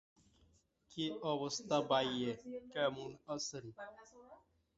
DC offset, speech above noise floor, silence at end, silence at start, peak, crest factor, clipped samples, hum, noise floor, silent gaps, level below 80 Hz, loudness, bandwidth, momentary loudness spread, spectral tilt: under 0.1%; 33 dB; 0.4 s; 0.9 s; -20 dBFS; 22 dB; under 0.1%; none; -73 dBFS; none; -76 dBFS; -39 LUFS; 8 kHz; 18 LU; -3 dB/octave